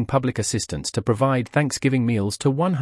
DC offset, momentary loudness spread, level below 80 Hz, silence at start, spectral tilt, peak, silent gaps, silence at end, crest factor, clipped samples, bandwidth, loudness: under 0.1%; 5 LU; -50 dBFS; 0 s; -5.5 dB/octave; -6 dBFS; none; 0 s; 16 dB; under 0.1%; 12 kHz; -22 LUFS